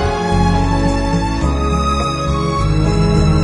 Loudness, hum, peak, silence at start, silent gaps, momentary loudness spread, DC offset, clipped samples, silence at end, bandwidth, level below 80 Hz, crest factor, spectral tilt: -16 LUFS; none; -2 dBFS; 0 s; none; 4 LU; under 0.1%; under 0.1%; 0 s; 10.5 kHz; -20 dBFS; 12 dB; -6.5 dB/octave